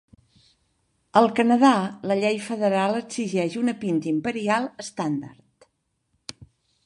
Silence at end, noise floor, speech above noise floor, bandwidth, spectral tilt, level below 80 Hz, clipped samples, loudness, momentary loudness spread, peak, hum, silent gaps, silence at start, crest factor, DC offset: 1.55 s; -72 dBFS; 50 dB; 11.5 kHz; -5.5 dB/octave; -68 dBFS; under 0.1%; -23 LUFS; 16 LU; -2 dBFS; none; none; 1.15 s; 22 dB; under 0.1%